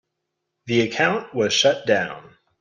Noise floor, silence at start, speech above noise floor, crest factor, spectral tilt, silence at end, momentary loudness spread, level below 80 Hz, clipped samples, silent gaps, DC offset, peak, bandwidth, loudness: -79 dBFS; 0.65 s; 58 dB; 18 dB; -3.5 dB/octave; 0.4 s; 8 LU; -64 dBFS; under 0.1%; none; under 0.1%; -6 dBFS; 10 kHz; -20 LUFS